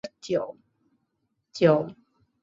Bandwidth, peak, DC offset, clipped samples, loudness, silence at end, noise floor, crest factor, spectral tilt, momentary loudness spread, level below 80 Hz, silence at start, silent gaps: 7.8 kHz; -6 dBFS; under 0.1%; under 0.1%; -25 LUFS; 0.5 s; -77 dBFS; 22 dB; -6.5 dB/octave; 17 LU; -68 dBFS; 0.05 s; none